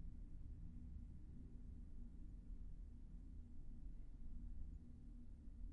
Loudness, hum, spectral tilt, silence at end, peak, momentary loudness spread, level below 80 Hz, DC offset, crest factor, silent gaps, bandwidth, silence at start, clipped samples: -60 LUFS; none; -10.5 dB/octave; 0 s; -40 dBFS; 3 LU; -54 dBFS; under 0.1%; 12 dB; none; 2.4 kHz; 0 s; under 0.1%